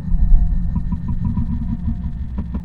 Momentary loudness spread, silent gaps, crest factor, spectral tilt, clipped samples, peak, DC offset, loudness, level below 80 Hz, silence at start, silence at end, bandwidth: 7 LU; none; 16 dB; -11 dB/octave; under 0.1%; 0 dBFS; 2%; -23 LUFS; -18 dBFS; 0 s; 0 s; 2 kHz